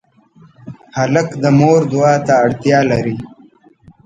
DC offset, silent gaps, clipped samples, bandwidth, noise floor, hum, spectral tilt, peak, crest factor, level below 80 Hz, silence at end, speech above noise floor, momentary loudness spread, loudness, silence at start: under 0.1%; none; under 0.1%; 8.8 kHz; -47 dBFS; none; -7 dB/octave; 0 dBFS; 14 dB; -50 dBFS; 0.8 s; 34 dB; 10 LU; -13 LUFS; 0.65 s